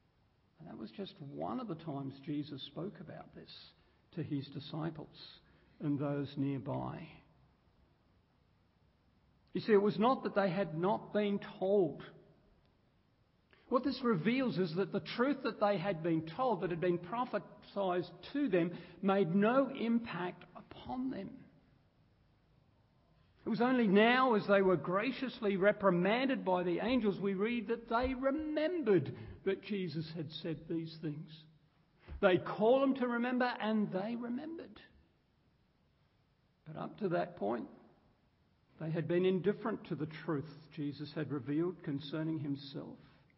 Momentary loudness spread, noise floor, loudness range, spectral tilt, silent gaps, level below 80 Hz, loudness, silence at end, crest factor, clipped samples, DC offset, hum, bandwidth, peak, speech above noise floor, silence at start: 17 LU; -73 dBFS; 12 LU; -5 dB/octave; none; -66 dBFS; -35 LUFS; 0.4 s; 22 dB; under 0.1%; under 0.1%; none; 5.6 kHz; -16 dBFS; 39 dB; 0.6 s